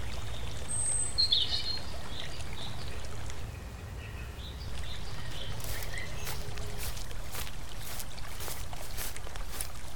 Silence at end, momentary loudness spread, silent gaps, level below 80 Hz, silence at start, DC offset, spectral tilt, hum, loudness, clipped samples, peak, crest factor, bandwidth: 0 s; 14 LU; none; -42 dBFS; 0 s; 2%; -2 dB/octave; none; -36 LUFS; under 0.1%; -12 dBFS; 22 dB; 19 kHz